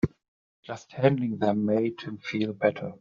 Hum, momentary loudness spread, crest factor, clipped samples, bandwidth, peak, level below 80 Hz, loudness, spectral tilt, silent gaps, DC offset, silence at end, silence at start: none; 14 LU; 22 dB; under 0.1%; 7.4 kHz; -6 dBFS; -58 dBFS; -27 LUFS; -6.5 dB/octave; 0.28-0.63 s; under 0.1%; 0.05 s; 0.05 s